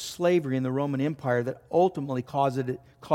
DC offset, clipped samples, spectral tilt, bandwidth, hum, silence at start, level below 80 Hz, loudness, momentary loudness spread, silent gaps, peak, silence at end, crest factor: under 0.1%; under 0.1%; -6.5 dB/octave; 16 kHz; none; 0 s; -66 dBFS; -27 LUFS; 8 LU; none; -8 dBFS; 0 s; 18 dB